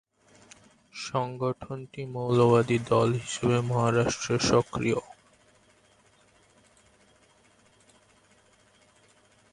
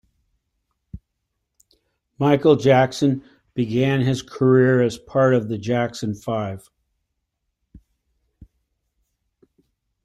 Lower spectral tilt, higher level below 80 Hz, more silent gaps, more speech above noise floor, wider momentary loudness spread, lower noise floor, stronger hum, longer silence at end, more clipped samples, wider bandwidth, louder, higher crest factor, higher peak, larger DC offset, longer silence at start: second, -5.5 dB/octave vs -7 dB/octave; about the same, -58 dBFS vs -56 dBFS; neither; second, 36 dB vs 58 dB; first, 15 LU vs 12 LU; second, -62 dBFS vs -77 dBFS; neither; first, 4.5 s vs 3.45 s; neither; about the same, 11.5 kHz vs 12 kHz; second, -27 LUFS vs -20 LUFS; about the same, 20 dB vs 18 dB; second, -10 dBFS vs -4 dBFS; neither; about the same, 0.95 s vs 0.95 s